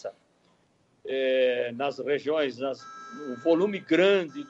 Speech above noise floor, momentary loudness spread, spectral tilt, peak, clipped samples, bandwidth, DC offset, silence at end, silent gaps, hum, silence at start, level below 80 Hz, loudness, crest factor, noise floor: 40 dB; 17 LU; -5.5 dB/octave; -12 dBFS; under 0.1%; 7.8 kHz; under 0.1%; 0.05 s; none; none; 0.05 s; -78 dBFS; -26 LUFS; 16 dB; -66 dBFS